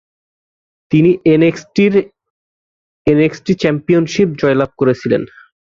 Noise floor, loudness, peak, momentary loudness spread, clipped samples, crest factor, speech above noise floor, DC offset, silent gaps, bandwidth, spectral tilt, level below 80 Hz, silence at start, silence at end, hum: under -90 dBFS; -14 LUFS; 0 dBFS; 7 LU; under 0.1%; 14 dB; over 77 dB; under 0.1%; 2.30-3.05 s; 7.4 kHz; -7 dB/octave; -48 dBFS; 0.9 s; 0.55 s; none